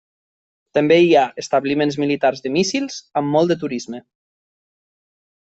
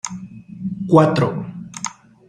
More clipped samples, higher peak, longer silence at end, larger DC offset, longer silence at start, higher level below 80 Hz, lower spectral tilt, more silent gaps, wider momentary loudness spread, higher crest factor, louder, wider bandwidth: neither; about the same, -2 dBFS vs -2 dBFS; first, 1.6 s vs 0.35 s; neither; first, 0.75 s vs 0.05 s; second, -62 dBFS vs -56 dBFS; about the same, -5 dB/octave vs -6 dB/octave; neither; second, 12 LU vs 19 LU; about the same, 16 dB vs 18 dB; about the same, -18 LUFS vs -19 LUFS; second, 8.2 kHz vs 10.5 kHz